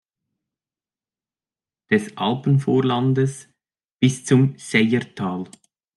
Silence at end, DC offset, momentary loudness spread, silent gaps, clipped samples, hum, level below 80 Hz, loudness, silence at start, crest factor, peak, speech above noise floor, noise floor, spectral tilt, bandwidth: 0.5 s; under 0.1%; 9 LU; 3.92-3.97 s; under 0.1%; none; -66 dBFS; -20 LUFS; 1.9 s; 18 dB; -4 dBFS; over 71 dB; under -90 dBFS; -6.5 dB/octave; 12 kHz